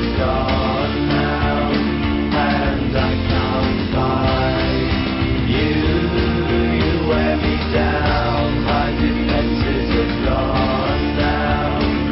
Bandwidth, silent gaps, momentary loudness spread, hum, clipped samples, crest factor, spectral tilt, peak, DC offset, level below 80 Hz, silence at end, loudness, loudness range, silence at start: 5.8 kHz; none; 2 LU; none; under 0.1%; 14 dB; -11 dB/octave; -4 dBFS; under 0.1%; -24 dBFS; 0 s; -18 LUFS; 1 LU; 0 s